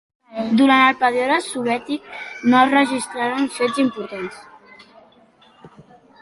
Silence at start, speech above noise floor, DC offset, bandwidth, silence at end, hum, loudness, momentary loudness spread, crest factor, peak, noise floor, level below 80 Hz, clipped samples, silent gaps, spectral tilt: 0.3 s; 34 dB; under 0.1%; 11.5 kHz; 0.55 s; none; -18 LUFS; 16 LU; 18 dB; -2 dBFS; -52 dBFS; -62 dBFS; under 0.1%; none; -4 dB/octave